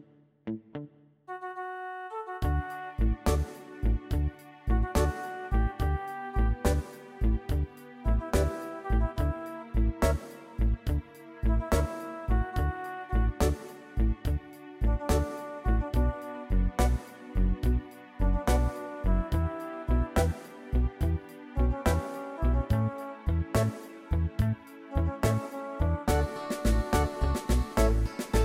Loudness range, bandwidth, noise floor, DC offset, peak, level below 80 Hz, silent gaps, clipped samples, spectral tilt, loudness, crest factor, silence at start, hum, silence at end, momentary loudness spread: 2 LU; 16 kHz; -49 dBFS; under 0.1%; -10 dBFS; -30 dBFS; none; under 0.1%; -6.5 dB/octave; -31 LUFS; 18 dB; 0.45 s; none; 0 s; 10 LU